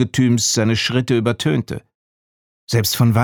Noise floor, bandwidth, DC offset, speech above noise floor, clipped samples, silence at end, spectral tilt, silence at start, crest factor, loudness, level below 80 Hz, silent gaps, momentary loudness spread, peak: under -90 dBFS; 19 kHz; under 0.1%; over 73 dB; under 0.1%; 0 s; -4.5 dB/octave; 0 s; 16 dB; -17 LUFS; -50 dBFS; 1.95-2.67 s; 7 LU; -2 dBFS